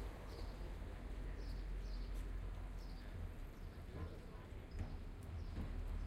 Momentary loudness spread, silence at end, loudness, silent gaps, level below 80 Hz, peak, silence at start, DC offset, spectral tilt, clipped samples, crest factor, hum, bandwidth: 5 LU; 0 s; -51 LUFS; none; -48 dBFS; -32 dBFS; 0 s; under 0.1%; -6.5 dB/octave; under 0.1%; 14 dB; none; 13.5 kHz